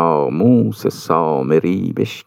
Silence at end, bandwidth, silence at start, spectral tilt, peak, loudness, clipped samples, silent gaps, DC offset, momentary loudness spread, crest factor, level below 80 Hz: 0.05 s; 16 kHz; 0 s; -7.5 dB/octave; -2 dBFS; -16 LUFS; under 0.1%; none; under 0.1%; 6 LU; 14 dB; -64 dBFS